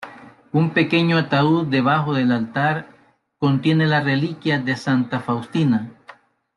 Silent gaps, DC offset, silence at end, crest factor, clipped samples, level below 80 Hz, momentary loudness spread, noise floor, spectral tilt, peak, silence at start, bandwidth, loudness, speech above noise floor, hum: none; under 0.1%; 0.45 s; 16 dB; under 0.1%; -62 dBFS; 6 LU; -56 dBFS; -7.5 dB/octave; -4 dBFS; 0 s; 10.5 kHz; -20 LUFS; 38 dB; none